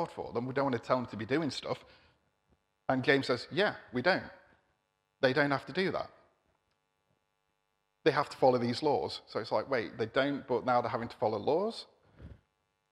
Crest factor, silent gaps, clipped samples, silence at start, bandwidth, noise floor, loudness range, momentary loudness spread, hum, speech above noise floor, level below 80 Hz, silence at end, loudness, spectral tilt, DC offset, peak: 24 dB; none; under 0.1%; 0 s; 12 kHz; -80 dBFS; 4 LU; 10 LU; none; 49 dB; -68 dBFS; 0.6 s; -32 LUFS; -6 dB/octave; under 0.1%; -10 dBFS